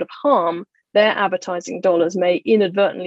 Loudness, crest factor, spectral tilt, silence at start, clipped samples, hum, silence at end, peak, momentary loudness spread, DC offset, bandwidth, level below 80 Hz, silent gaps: -18 LUFS; 16 dB; -5 dB/octave; 0 s; under 0.1%; none; 0 s; -2 dBFS; 8 LU; under 0.1%; 8 kHz; -70 dBFS; none